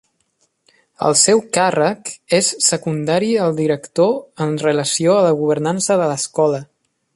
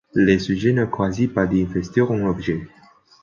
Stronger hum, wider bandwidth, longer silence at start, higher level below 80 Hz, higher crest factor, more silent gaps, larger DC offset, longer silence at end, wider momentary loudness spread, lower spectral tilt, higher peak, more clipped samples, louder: neither; first, 11.5 kHz vs 7.2 kHz; first, 1 s vs 0.15 s; second, -62 dBFS vs -44 dBFS; about the same, 16 dB vs 16 dB; neither; neither; about the same, 0.5 s vs 0.55 s; about the same, 7 LU vs 6 LU; second, -3.5 dB/octave vs -7.5 dB/octave; first, 0 dBFS vs -4 dBFS; neither; first, -16 LUFS vs -20 LUFS